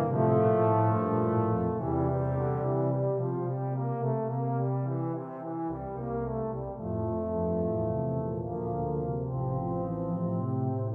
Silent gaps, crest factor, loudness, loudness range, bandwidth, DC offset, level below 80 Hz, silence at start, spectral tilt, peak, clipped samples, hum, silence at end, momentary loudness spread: none; 16 dB; -30 LUFS; 5 LU; 3 kHz; under 0.1%; -50 dBFS; 0 s; -12.5 dB/octave; -14 dBFS; under 0.1%; none; 0 s; 9 LU